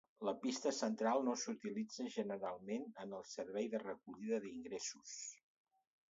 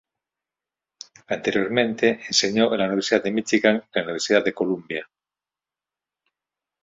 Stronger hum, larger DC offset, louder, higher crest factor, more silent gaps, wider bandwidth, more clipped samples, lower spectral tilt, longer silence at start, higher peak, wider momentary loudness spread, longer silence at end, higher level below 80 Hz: neither; neither; second, -43 LUFS vs -22 LUFS; about the same, 20 dB vs 22 dB; neither; about the same, 7.6 kHz vs 7.8 kHz; neither; about the same, -4 dB/octave vs -3.5 dB/octave; second, 0.2 s vs 1.3 s; second, -24 dBFS vs -2 dBFS; first, 11 LU vs 7 LU; second, 0.75 s vs 1.8 s; second, -86 dBFS vs -64 dBFS